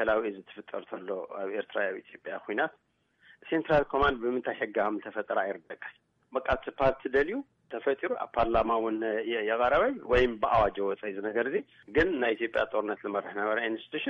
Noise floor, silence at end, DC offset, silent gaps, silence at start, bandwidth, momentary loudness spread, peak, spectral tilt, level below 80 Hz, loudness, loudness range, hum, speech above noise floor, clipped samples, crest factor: -62 dBFS; 0 s; under 0.1%; none; 0 s; 7 kHz; 13 LU; -14 dBFS; -7 dB/octave; -50 dBFS; -30 LUFS; 4 LU; none; 32 dB; under 0.1%; 16 dB